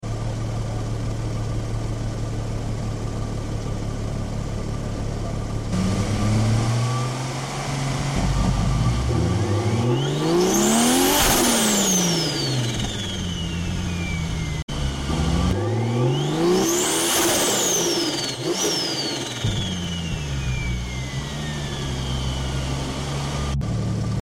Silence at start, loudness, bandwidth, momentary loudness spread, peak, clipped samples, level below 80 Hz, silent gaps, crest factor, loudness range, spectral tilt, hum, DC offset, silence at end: 0 s; -23 LUFS; 17 kHz; 11 LU; -6 dBFS; under 0.1%; -32 dBFS; 14.63-14.68 s; 16 dB; 9 LU; -4 dB/octave; none; under 0.1%; 0.05 s